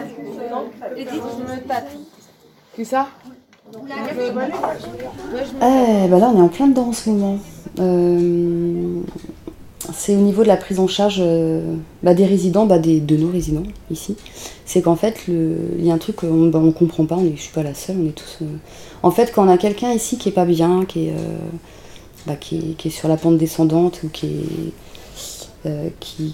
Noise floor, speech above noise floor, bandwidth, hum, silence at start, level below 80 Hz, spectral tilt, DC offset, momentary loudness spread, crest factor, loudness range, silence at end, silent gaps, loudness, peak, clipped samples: -50 dBFS; 32 dB; 16.5 kHz; none; 0 s; -44 dBFS; -6.5 dB/octave; under 0.1%; 17 LU; 18 dB; 10 LU; 0 s; none; -18 LUFS; 0 dBFS; under 0.1%